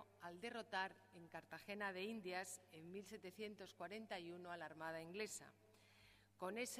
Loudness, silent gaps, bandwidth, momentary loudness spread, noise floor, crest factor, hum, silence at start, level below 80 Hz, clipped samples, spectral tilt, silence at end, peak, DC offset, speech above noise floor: -51 LUFS; none; 15.5 kHz; 11 LU; -71 dBFS; 22 dB; none; 0 s; -88 dBFS; under 0.1%; -3 dB/octave; 0 s; -32 dBFS; under 0.1%; 20 dB